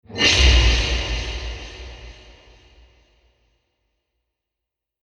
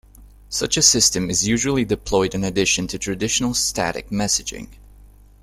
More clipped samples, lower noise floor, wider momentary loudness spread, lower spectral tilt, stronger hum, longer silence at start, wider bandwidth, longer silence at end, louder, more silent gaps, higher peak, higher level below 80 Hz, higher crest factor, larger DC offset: neither; first, -85 dBFS vs -46 dBFS; first, 24 LU vs 11 LU; about the same, -3 dB/octave vs -2.5 dB/octave; second, none vs 50 Hz at -40 dBFS; about the same, 0.1 s vs 0.2 s; second, 10 kHz vs 16 kHz; first, 2.9 s vs 0.7 s; about the same, -18 LUFS vs -19 LUFS; neither; about the same, -2 dBFS vs 0 dBFS; first, -26 dBFS vs -42 dBFS; about the same, 22 dB vs 22 dB; neither